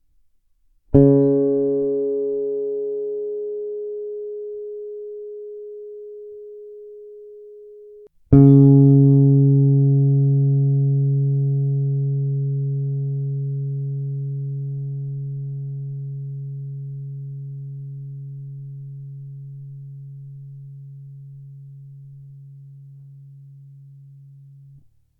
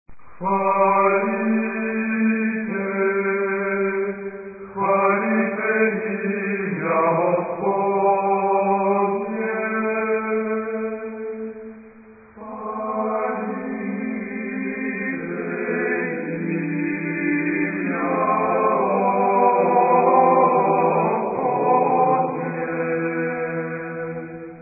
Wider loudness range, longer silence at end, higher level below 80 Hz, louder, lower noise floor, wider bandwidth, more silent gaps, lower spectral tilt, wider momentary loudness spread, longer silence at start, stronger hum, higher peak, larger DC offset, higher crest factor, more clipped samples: first, 23 LU vs 9 LU; first, 1.2 s vs 0 s; first, -46 dBFS vs -64 dBFS; about the same, -19 LUFS vs -21 LUFS; first, -60 dBFS vs -46 dBFS; second, 1.5 kHz vs 2.7 kHz; neither; about the same, -15 dB/octave vs -15 dB/octave; first, 25 LU vs 11 LU; first, 0.9 s vs 0.1 s; neither; first, 0 dBFS vs -4 dBFS; neither; about the same, 20 dB vs 18 dB; neither